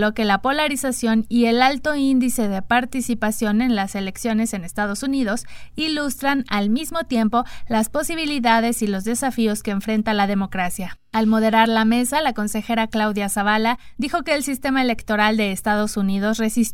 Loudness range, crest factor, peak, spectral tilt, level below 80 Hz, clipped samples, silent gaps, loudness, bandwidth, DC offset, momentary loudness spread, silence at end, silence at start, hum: 3 LU; 18 dB; -2 dBFS; -4 dB/octave; -44 dBFS; under 0.1%; none; -20 LUFS; 17 kHz; under 0.1%; 7 LU; 0 s; 0 s; none